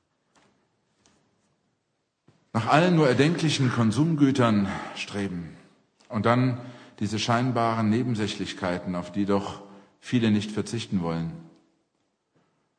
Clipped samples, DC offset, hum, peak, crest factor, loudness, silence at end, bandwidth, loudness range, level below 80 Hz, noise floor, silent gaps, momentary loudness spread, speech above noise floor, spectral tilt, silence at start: under 0.1%; under 0.1%; none; -4 dBFS; 22 dB; -25 LUFS; 1.3 s; 10 kHz; 6 LU; -62 dBFS; -76 dBFS; none; 14 LU; 52 dB; -6 dB/octave; 2.55 s